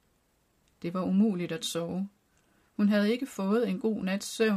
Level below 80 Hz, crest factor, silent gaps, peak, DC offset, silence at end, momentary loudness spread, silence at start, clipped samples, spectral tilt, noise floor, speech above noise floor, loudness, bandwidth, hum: -70 dBFS; 14 dB; none; -16 dBFS; under 0.1%; 0 s; 10 LU; 0.8 s; under 0.1%; -5.5 dB/octave; -70 dBFS; 42 dB; -29 LUFS; 15 kHz; none